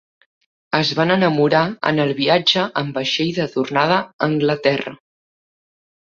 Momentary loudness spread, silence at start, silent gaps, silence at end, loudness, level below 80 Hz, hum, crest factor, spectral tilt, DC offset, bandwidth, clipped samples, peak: 6 LU; 0.7 s; 4.13-4.19 s; 1.1 s; -18 LUFS; -60 dBFS; none; 18 dB; -5.5 dB/octave; under 0.1%; 7.6 kHz; under 0.1%; 0 dBFS